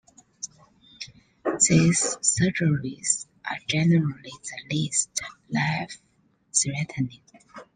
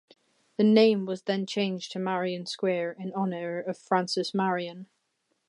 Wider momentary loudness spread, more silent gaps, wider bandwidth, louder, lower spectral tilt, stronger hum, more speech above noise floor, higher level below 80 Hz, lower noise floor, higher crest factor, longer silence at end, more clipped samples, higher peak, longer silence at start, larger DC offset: first, 18 LU vs 12 LU; neither; about the same, 10 kHz vs 11 kHz; first, -24 LUFS vs -27 LUFS; second, -4 dB/octave vs -5.5 dB/octave; neither; second, 31 dB vs 49 dB; first, -58 dBFS vs -84 dBFS; second, -56 dBFS vs -76 dBFS; about the same, 20 dB vs 20 dB; second, 0.15 s vs 0.65 s; neither; about the same, -6 dBFS vs -8 dBFS; second, 0.4 s vs 0.6 s; neither